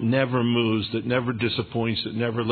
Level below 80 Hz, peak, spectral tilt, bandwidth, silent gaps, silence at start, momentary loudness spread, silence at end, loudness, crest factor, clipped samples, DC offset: -58 dBFS; -8 dBFS; -10 dB/octave; 4.6 kHz; none; 0 s; 4 LU; 0 s; -24 LUFS; 16 dB; under 0.1%; under 0.1%